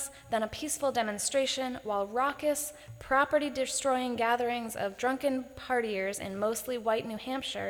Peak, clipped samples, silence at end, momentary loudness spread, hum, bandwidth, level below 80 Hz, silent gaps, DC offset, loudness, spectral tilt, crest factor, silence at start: -12 dBFS; under 0.1%; 0 s; 6 LU; none; over 20 kHz; -62 dBFS; none; under 0.1%; -31 LUFS; -2.5 dB/octave; 18 dB; 0 s